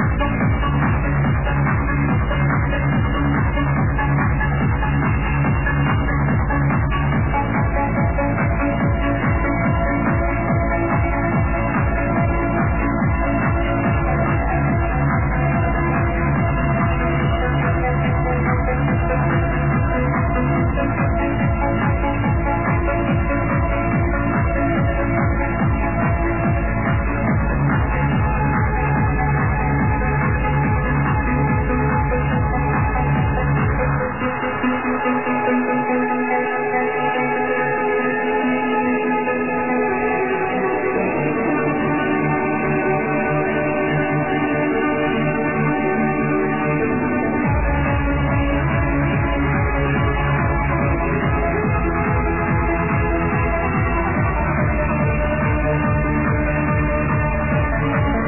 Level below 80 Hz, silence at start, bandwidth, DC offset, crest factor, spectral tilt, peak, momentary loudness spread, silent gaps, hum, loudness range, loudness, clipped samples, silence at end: -26 dBFS; 0 s; 3.1 kHz; 1%; 12 dB; -11.5 dB/octave; -6 dBFS; 1 LU; none; none; 1 LU; -19 LUFS; under 0.1%; 0 s